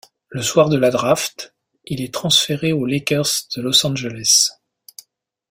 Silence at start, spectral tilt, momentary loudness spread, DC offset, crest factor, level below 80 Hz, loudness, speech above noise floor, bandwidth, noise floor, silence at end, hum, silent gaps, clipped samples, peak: 0.3 s; -3 dB/octave; 13 LU; under 0.1%; 18 dB; -56 dBFS; -17 LUFS; 44 dB; 16.5 kHz; -62 dBFS; 1 s; none; none; under 0.1%; 0 dBFS